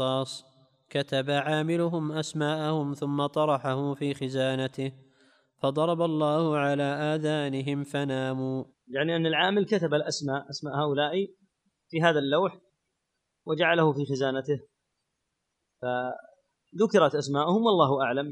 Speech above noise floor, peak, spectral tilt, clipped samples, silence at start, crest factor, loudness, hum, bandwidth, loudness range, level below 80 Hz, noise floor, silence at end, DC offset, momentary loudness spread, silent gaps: 54 dB; -6 dBFS; -6 dB/octave; under 0.1%; 0 s; 22 dB; -27 LUFS; none; 11.5 kHz; 2 LU; -76 dBFS; -81 dBFS; 0 s; under 0.1%; 10 LU; none